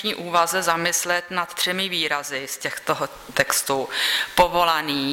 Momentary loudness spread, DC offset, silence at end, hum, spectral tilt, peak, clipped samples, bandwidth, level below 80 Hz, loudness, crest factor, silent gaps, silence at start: 8 LU; under 0.1%; 0 s; none; -1.5 dB/octave; -4 dBFS; under 0.1%; 16.5 kHz; -50 dBFS; -22 LUFS; 18 dB; none; 0 s